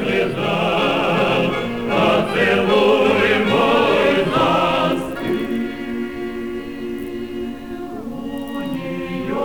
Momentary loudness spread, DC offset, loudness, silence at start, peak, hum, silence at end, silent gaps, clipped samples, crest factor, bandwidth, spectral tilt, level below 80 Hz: 13 LU; 0.8%; -18 LUFS; 0 s; -4 dBFS; none; 0 s; none; under 0.1%; 14 dB; over 20 kHz; -6 dB/octave; -46 dBFS